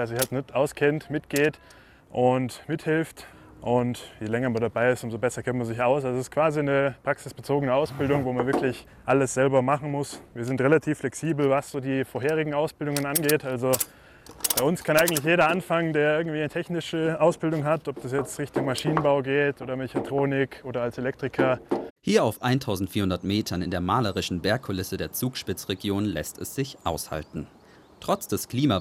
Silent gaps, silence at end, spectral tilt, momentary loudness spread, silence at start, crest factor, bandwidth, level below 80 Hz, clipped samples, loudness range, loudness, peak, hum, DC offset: 21.90-21.96 s; 0 s; -5 dB/octave; 9 LU; 0 s; 18 dB; 16 kHz; -56 dBFS; under 0.1%; 4 LU; -26 LUFS; -8 dBFS; none; under 0.1%